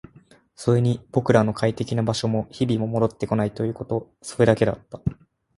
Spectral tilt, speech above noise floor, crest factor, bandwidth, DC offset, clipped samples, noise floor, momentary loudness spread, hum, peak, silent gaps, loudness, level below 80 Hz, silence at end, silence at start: -7 dB/octave; 31 dB; 20 dB; 11.5 kHz; under 0.1%; under 0.1%; -54 dBFS; 10 LU; none; -2 dBFS; none; -23 LUFS; -50 dBFS; 0.45 s; 0.6 s